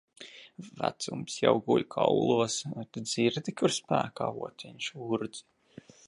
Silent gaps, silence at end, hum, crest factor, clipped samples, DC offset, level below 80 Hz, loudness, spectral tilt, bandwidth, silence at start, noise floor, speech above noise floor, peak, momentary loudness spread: none; 0.65 s; none; 22 dB; under 0.1%; under 0.1%; -70 dBFS; -30 LUFS; -4.5 dB/octave; 11.5 kHz; 0.2 s; -54 dBFS; 24 dB; -8 dBFS; 19 LU